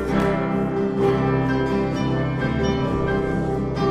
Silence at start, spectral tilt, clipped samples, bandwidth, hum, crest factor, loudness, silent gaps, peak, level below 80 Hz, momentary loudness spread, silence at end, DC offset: 0 s; -8 dB/octave; under 0.1%; 11 kHz; none; 14 dB; -22 LUFS; none; -6 dBFS; -36 dBFS; 3 LU; 0 s; under 0.1%